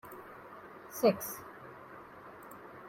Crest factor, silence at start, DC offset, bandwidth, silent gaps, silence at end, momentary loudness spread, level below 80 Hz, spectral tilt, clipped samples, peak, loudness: 24 dB; 0.05 s; under 0.1%; 16.5 kHz; none; 0 s; 21 LU; -74 dBFS; -5 dB/octave; under 0.1%; -14 dBFS; -33 LUFS